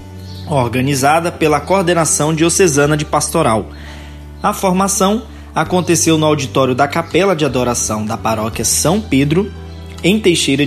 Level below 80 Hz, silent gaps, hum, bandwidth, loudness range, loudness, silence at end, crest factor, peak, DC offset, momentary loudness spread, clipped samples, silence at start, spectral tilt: -34 dBFS; none; none; 14.5 kHz; 2 LU; -14 LUFS; 0 s; 14 dB; 0 dBFS; under 0.1%; 11 LU; under 0.1%; 0 s; -4 dB/octave